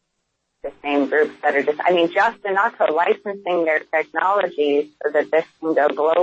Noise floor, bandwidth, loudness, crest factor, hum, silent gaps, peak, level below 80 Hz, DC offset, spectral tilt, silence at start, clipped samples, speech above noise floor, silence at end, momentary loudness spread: -74 dBFS; 7.8 kHz; -20 LUFS; 14 dB; none; none; -4 dBFS; -66 dBFS; under 0.1%; -5.5 dB/octave; 0.65 s; under 0.1%; 55 dB; 0 s; 5 LU